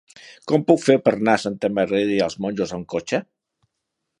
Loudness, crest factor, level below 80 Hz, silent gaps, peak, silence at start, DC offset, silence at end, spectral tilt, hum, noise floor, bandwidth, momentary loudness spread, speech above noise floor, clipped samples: -21 LUFS; 20 dB; -60 dBFS; none; -2 dBFS; 0.25 s; under 0.1%; 0.95 s; -5.5 dB/octave; none; -79 dBFS; 11.5 kHz; 10 LU; 59 dB; under 0.1%